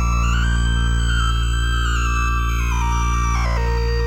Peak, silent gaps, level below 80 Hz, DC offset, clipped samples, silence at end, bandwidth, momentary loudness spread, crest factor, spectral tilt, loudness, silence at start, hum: -8 dBFS; none; -20 dBFS; under 0.1%; under 0.1%; 0 s; 8.4 kHz; 2 LU; 10 dB; -4.5 dB/octave; -20 LUFS; 0 s; none